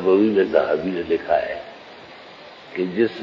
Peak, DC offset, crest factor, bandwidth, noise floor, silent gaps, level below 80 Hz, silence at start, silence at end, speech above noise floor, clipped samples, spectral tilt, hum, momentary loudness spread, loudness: -4 dBFS; under 0.1%; 18 dB; 7 kHz; -42 dBFS; none; -56 dBFS; 0 s; 0 s; 22 dB; under 0.1%; -7.5 dB/octave; none; 23 LU; -21 LUFS